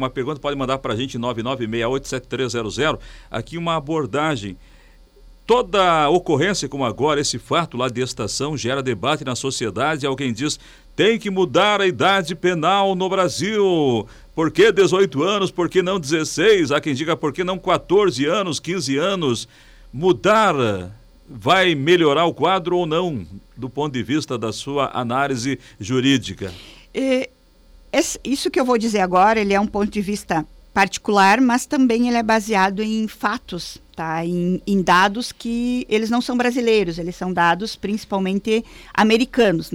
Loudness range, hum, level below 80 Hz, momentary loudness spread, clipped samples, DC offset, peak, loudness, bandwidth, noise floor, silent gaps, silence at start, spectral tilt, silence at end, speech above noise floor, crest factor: 5 LU; none; -48 dBFS; 11 LU; under 0.1%; under 0.1%; -6 dBFS; -19 LUFS; 16.5 kHz; -49 dBFS; none; 0 s; -4.5 dB/octave; 0 s; 30 dB; 14 dB